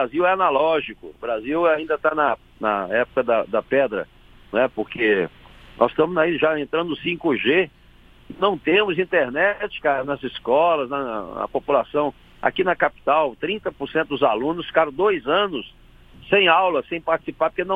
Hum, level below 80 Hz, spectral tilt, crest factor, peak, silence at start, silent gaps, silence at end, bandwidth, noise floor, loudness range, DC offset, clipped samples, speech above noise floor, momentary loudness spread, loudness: none; -52 dBFS; -7 dB/octave; 20 dB; -2 dBFS; 0 s; none; 0 s; 4.9 kHz; -50 dBFS; 2 LU; under 0.1%; under 0.1%; 29 dB; 9 LU; -21 LUFS